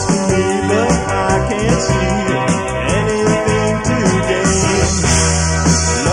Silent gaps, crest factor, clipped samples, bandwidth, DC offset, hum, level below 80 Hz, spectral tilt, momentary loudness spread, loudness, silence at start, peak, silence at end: none; 12 dB; under 0.1%; 11.5 kHz; under 0.1%; none; -26 dBFS; -4.5 dB/octave; 3 LU; -14 LUFS; 0 s; -2 dBFS; 0 s